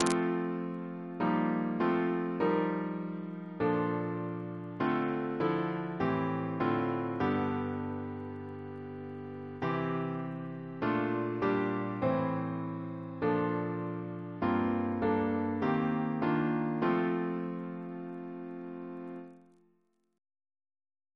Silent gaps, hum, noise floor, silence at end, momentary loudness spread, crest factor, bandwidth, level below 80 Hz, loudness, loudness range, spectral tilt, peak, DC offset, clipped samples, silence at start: none; none; -74 dBFS; 1.75 s; 12 LU; 26 dB; 11 kHz; -68 dBFS; -33 LUFS; 5 LU; -7.5 dB/octave; -8 dBFS; under 0.1%; under 0.1%; 0 s